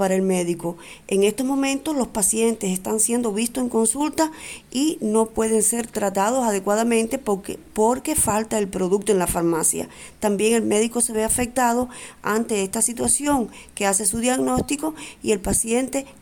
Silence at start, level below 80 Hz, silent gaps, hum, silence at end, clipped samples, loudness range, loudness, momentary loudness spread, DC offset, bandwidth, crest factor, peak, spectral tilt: 0 s; -46 dBFS; none; none; 0.1 s; under 0.1%; 1 LU; -21 LUFS; 7 LU; under 0.1%; 19 kHz; 16 dB; -6 dBFS; -3.5 dB/octave